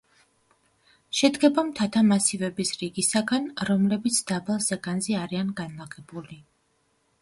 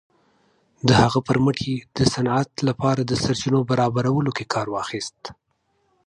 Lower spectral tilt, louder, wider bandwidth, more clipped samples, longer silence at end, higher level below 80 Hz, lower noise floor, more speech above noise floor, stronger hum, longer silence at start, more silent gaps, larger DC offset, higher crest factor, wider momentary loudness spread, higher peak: second, -4 dB/octave vs -5.5 dB/octave; second, -24 LUFS vs -21 LUFS; about the same, 11.5 kHz vs 11 kHz; neither; about the same, 0.8 s vs 0.75 s; second, -64 dBFS vs -48 dBFS; about the same, -69 dBFS vs -69 dBFS; second, 44 dB vs 48 dB; neither; first, 1.15 s vs 0.85 s; neither; neither; about the same, 22 dB vs 20 dB; first, 16 LU vs 10 LU; about the same, -4 dBFS vs -2 dBFS